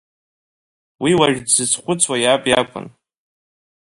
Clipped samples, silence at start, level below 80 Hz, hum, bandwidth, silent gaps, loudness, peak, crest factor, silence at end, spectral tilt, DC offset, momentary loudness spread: under 0.1%; 1 s; -54 dBFS; none; 11.5 kHz; none; -16 LUFS; 0 dBFS; 20 dB; 0.9 s; -3 dB/octave; under 0.1%; 8 LU